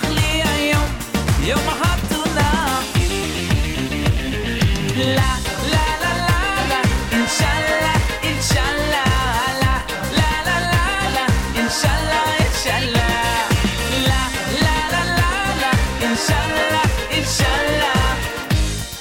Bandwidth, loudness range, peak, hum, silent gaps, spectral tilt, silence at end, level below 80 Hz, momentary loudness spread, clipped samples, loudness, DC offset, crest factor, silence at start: 18 kHz; 2 LU; -8 dBFS; none; none; -4 dB/octave; 0 s; -26 dBFS; 3 LU; under 0.1%; -18 LUFS; under 0.1%; 10 dB; 0 s